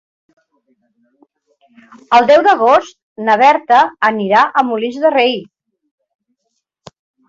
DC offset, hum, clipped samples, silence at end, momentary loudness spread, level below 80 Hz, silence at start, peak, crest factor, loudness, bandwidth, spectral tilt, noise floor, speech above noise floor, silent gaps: under 0.1%; none; under 0.1%; 1.85 s; 8 LU; -62 dBFS; 2.1 s; 0 dBFS; 14 dB; -12 LUFS; 7.8 kHz; -4.5 dB/octave; -71 dBFS; 59 dB; 3.03-3.16 s